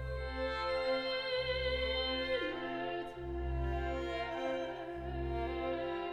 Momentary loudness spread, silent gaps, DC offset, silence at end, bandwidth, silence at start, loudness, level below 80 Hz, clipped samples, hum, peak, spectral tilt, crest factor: 7 LU; none; under 0.1%; 0 s; 9.4 kHz; 0 s; -37 LUFS; -46 dBFS; under 0.1%; none; -24 dBFS; -6.5 dB/octave; 14 dB